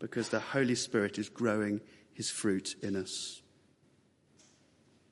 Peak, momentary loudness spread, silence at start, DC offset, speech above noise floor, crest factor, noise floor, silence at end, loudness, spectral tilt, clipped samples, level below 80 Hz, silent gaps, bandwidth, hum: -16 dBFS; 9 LU; 0 s; under 0.1%; 34 dB; 20 dB; -68 dBFS; 1.7 s; -34 LUFS; -4 dB/octave; under 0.1%; -76 dBFS; none; 11.5 kHz; none